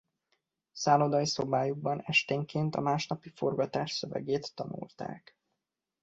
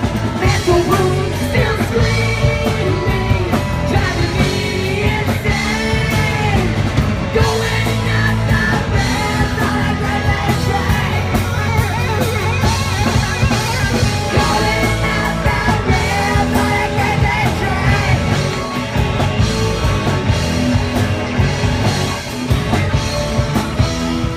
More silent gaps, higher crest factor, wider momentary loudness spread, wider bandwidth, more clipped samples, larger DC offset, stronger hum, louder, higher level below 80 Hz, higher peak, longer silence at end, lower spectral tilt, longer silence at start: neither; first, 20 dB vs 12 dB; first, 14 LU vs 3 LU; second, 8 kHz vs 16 kHz; neither; neither; neither; second, -31 LUFS vs -16 LUFS; second, -70 dBFS vs -24 dBFS; second, -12 dBFS vs -2 dBFS; first, 0.85 s vs 0 s; about the same, -5 dB/octave vs -5.5 dB/octave; first, 0.75 s vs 0 s